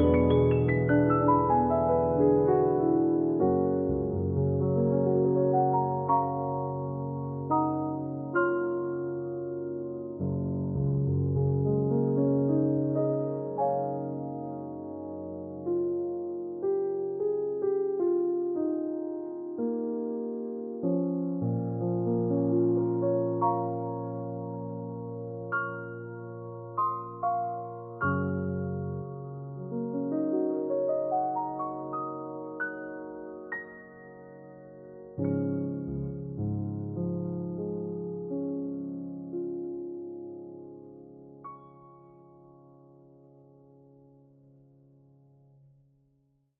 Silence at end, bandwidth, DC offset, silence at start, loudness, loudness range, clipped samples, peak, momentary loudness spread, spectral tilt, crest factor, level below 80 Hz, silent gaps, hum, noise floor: 4.1 s; 3.6 kHz; under 0.1%; 0 s; -30 LUFS; 11 LU; under 0.1%; -12 dBFS; 15 LU; -9.5 dB/octave; 18 dB; -56 dBFS; none; none; -70 dBFS